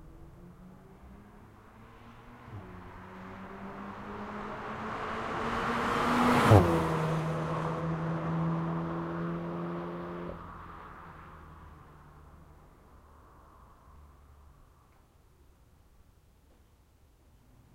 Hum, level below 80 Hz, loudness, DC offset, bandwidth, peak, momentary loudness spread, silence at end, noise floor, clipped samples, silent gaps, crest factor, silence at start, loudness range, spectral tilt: none; -54 dBFS; -31 LUFS; under 0.1%; 16 kHz; -4 dBFS; 27 LU; 3.1 s; -62 dBFS; under 0.1%; none; 32 dB; 0 s; 22 LU; -7 dB/octave